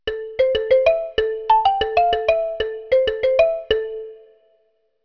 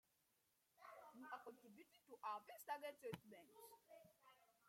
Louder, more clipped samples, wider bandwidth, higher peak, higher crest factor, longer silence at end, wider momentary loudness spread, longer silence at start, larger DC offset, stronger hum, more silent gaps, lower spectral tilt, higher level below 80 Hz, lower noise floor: first, -19 LUFS vs -57 LUFS; neither; second, 5.4 kHz vs 16.5 kHz; first, -4 dBFS vs -34 dBFS; second, 16 dB vs 26 dB; first, 0.9 s vs 0 s; second, 10 LU vs 15 LU; second, 0.05 s vs 0.75 s; neither; neither; neither; about the same, -4.5 dB/octave vs -4 dB/octave; first, -44 dBFS vs under -90 dBFS; second, -64 dBFS vs -85 dBFS